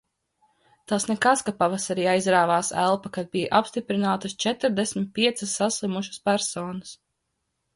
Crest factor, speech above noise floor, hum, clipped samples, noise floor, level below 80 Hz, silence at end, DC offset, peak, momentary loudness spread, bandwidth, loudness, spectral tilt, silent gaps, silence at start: 20 dB; 54 dB; none; under 0.1%; -78 dBFS; -64 dBFS; 0.8 s; under 0.1%; -6 dBFS; 8 LU; 11.5 kHz; -24 LUFS; -3.5 dB/octave; none; 0.9 s